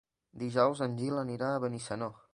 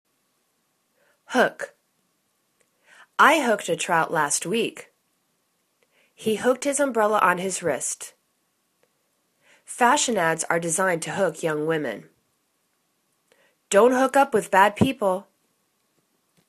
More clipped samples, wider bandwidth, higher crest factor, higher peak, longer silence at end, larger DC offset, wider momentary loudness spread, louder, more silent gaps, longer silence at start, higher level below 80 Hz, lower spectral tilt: neither; second, 11.5 kHz vs 14 kHz; about the same, 20 dB vs 24 dB; second, -12 dBFS vs -2 dBFS; second, 0.2 s vs 1.25 s; neither; second, 9 LU vs 13 LU; second, -33 LUFS vs -22 LUFS; neither; second, 0.35 s vs 1.3 s; about the same, -70 dBFS vs -66 dBFS; first, -6.5 dB/octave vs -3.5 dB/octave